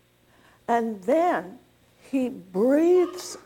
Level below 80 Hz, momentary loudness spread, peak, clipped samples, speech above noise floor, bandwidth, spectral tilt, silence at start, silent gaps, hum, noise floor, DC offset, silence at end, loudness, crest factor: -68 dBFS; 11 LU; -10 dBFS; under 0.1%; 36 dB; 16.5 kHz; -5.5 dB/octave; 0.7 s; none; 60 Hz at -60 dBFS; -59 dBFS; under 0.1%; 0.05 s; -24 LUFS; 14 dB